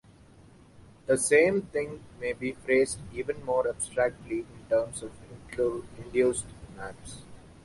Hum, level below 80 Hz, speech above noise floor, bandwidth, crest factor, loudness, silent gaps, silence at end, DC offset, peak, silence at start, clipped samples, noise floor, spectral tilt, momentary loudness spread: none; -56 dBFS; 26 dB; 11.5 kHz; 22 dB; -28 LUFS; none; 0.25 s; under 0.1%; -8 dBFS; 1.1 s; under 0.1%; -54 dBFS; -4 dB/octave; 20 LU